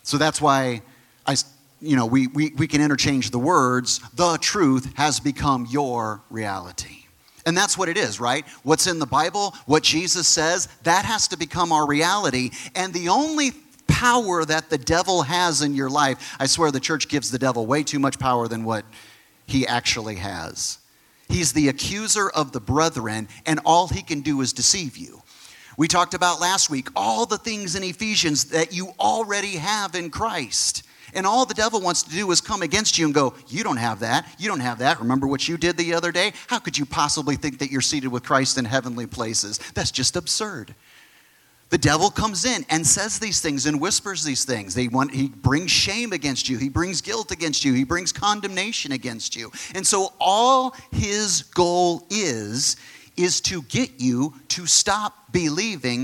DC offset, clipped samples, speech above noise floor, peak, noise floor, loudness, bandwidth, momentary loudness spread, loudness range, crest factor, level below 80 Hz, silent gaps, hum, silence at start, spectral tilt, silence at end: under 0.1%; under 0.1%; 34 dB; -2 dBFS; -56 dBFS; -21 LUFS; 17 kHz; 9 LU; 3 LU; 20 dB; -50 dBFS; none; none; 0.05 s; -3 dB/octave; 0 s